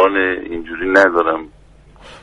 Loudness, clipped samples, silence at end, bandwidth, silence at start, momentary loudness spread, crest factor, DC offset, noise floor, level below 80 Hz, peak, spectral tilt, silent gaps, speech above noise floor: -16 LUFS; under 0.1%; 0.05 s; 11 kHz; 0 s; 13 LU; 16 dB; under 0.1%; -43 dBFS; -46 dBFS; 0 dBFS; -5 dB/octave; none; 27 dB